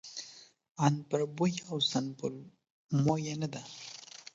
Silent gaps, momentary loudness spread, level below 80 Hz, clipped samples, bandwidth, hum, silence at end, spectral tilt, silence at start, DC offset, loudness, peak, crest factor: 0.71-0.75 s, 2.70-2.87 s; 16 LU; -72 dBFS; under 0.1%; 7.8 kHz; none; 0.05 s; -5.5 dB/octave; 0.05 s; under 0.1%; -33 LUFS; -10 dBFS; 24 dB